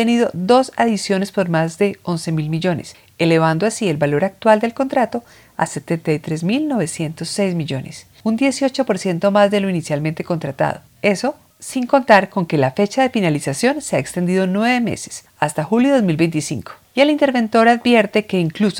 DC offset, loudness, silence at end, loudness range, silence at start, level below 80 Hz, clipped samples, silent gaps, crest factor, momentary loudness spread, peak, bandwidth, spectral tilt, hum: under 0.1%; -18 LUFS; 0 s; 4 LU; 0 s; -56 dBFS; under 0.1%; none; 18 dB; 10 LU; 0 dBFS; 17.5 kHz; -5.5 dB/octave; none